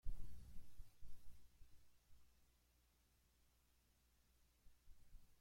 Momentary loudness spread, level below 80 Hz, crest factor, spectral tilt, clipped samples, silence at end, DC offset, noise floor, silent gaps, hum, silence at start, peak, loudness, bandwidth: 9 LU; -60 dBFS; 20 dB; -5 dB/octave; under 0.1%; 0.05 s; under 0.1%; -78 dBFS; none; none; 0.05 s; -32 dBFS; -65 LUFS; 16.5 kHz